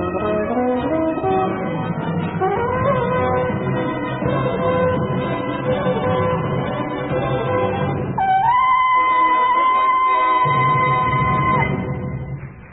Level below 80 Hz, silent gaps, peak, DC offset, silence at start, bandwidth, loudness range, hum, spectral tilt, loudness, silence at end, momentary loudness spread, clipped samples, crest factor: -42 dBFS; none; -6 dBFS; under 0.1%; 0 s; 4 kHz; 5 LU; none; -12 dB/octave; -18 LUFS; 0 s; 8 LU; under 0.1%; 12 dB